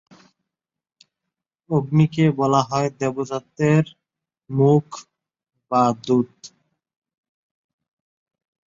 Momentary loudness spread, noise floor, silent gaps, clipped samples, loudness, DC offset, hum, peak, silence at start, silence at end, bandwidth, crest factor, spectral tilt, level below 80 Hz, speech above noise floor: 12 LU; -88 dBFS; none; under 0.1%; -20 LUFS; under 0.1%; none; -4 dBFS; 1.7 s; 2.2 s; 7.6 kHz; 18 dB; -7.5 dB/octave; -62 dBFS; 69 dB